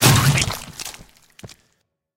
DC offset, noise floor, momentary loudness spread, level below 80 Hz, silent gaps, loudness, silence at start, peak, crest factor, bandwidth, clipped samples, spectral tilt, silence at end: under 0.1%; -69 dBFS; 20 LU; -40 dBFS; none; -18 LUFS; 0 s; 0 dBFS; 20 dB; 17 kHz; under 0.1%; -3.5 dB/octave; 0.7 s